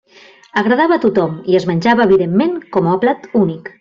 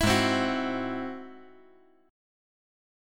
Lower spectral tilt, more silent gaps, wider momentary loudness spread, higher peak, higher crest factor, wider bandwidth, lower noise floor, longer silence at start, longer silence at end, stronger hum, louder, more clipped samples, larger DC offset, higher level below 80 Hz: first, -7.5 dB/octave vs -4.5 dB/octave; neither; second, 6 LU vs 19 LU; first, -2 dBFS vs -12 dBFS; second, 12 dB vs 20 dB; second, 7.4 kHz vs 17.5 kHz; second, -44 dBFS vs -59 dBFS; first, 0.55 s vs 0 s; second, 0.1 s vs 1.65 s; neither; first, -14 LUFS vs -28 LUFS; neither; neither; second, -54 dBFS vs -48 dBFS